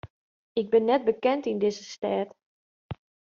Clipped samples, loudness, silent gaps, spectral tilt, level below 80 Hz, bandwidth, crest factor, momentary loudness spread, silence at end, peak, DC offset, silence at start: under 0.1%; -26 LUFS; 0.10-0.55 s, 2.43-2.89 s; -4.5 dB/octave; -64 dBFS; 7.4 kHz; 18 dB; 20 LU; 0.4 s; -10 dBFS; under 0.1%; 0.05 s